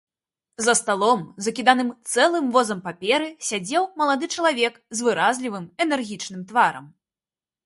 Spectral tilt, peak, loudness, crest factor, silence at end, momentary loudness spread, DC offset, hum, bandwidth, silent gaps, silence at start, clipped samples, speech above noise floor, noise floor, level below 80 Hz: -2.5 dB/octave; -2 dBFS; -22 LUFS; 20 dB; 0.75 s; 9 LU; under 0.1%; none; 11.5 kHz; none; 0.6 s; under 0.1%; over 68 dB; under -90 dBFS; -72 dBFS